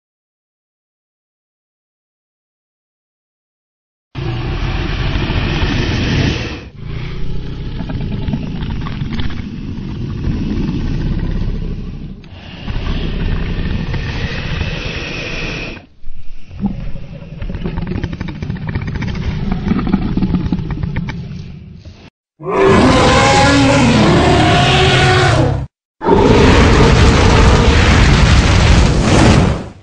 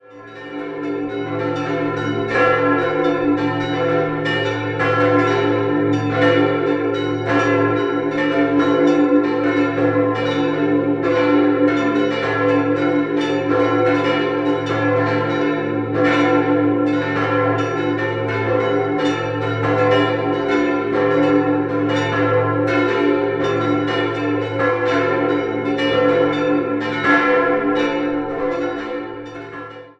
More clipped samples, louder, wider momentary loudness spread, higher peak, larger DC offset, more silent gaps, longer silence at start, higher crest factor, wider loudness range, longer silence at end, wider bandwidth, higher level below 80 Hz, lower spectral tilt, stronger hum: neither; first, -14 LUFS vs -18 LUFS; first, 17 LU vs 6 LU; about the same, 0 dBFS vs -2 dBFS; neither; first, 22.10-22.24 s, 25.85-25.95 s vs none; first, 4.15 s vs 0.1 s; about the same, 14 dB vs 16 dB; first, 14 LU vs 2 LU; about the same, 0.1 s vs 0.1 s; first, 10 kHz vs 8 kHz; first, -20 dBFS vs -52 dBFS; second, -5.5 dB/octave vs -7 dB/octave; neither